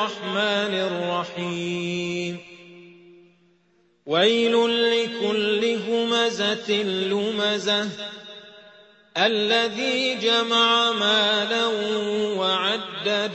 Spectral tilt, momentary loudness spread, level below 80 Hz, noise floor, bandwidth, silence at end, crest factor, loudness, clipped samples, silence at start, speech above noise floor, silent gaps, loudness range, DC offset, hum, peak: -3.5 dB/octave; 10 LU; -70 dBFS; -63 dBFS; 8.4 kHz; 0 s; 18 dB; -22 LUFS; under 0.1%; 0 s; 40 dB; none; 6 LU; under 0.1%; none; -6 dBFS